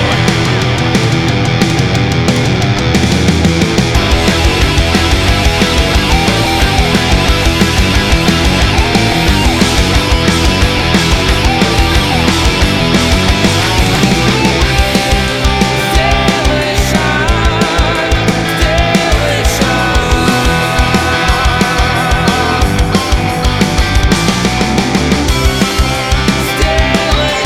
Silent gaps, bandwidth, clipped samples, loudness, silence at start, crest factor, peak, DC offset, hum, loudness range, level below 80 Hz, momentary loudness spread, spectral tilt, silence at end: none; 16.5 kHz; under 0.1%; -10 LUFS; 0 s; 10 dB; 0 dBFS; under 0.1%; none; 1 LU; -16 dBFS; 2 LU; -4.5 dB/octave; 0 s